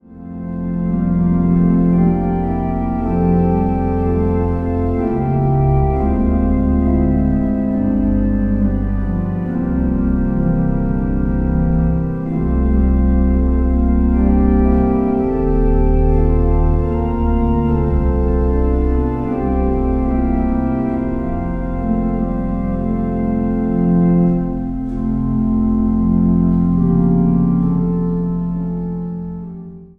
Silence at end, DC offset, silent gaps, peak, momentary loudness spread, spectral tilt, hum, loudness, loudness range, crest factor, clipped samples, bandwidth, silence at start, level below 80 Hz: 0.1 s; under 0.1%; none; -2 dBFS; 6 LU; -12.5 dB/octave; none; -17 LUFS; 3 LU; 14 dB; under 0.1%; 3 kHz; 0.1 s; -20 dBFS